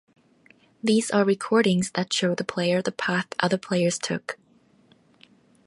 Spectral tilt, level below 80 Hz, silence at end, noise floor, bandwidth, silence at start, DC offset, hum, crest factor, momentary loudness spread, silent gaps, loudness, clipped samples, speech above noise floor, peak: -4.5 dB/octave; -68 dBFS; 1.35 s; -59 dBFS; 11.5 kHz; 0.85 s; under 0.1%; none; 20 dB; 9 LU; none; -24 LUFS; under 0.1%; 36 dB; -6 dBFS